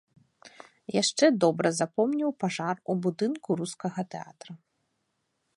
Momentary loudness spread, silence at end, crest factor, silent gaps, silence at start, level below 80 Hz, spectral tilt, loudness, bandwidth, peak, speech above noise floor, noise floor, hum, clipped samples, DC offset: 19 LU; 1 s; 20 dB; none; 0.45 s; -78 dBFS; -4.5 dB/octave; -28 LUFS; 11.5 kHz; -8 dBFS; 50 dB; -78 dBFS; none; under 0.1%; under 0.1%